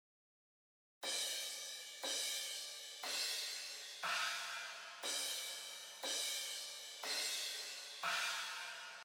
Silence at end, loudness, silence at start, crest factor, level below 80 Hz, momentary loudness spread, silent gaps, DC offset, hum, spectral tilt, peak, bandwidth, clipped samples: 0 s; -41 LUFS; 1 s; 18 dB; under -90 dBFS; 8 LU; none; under 0.1%; none; 2.5 dB/octave; -28 dBFS; 19 kHz; under 0.1%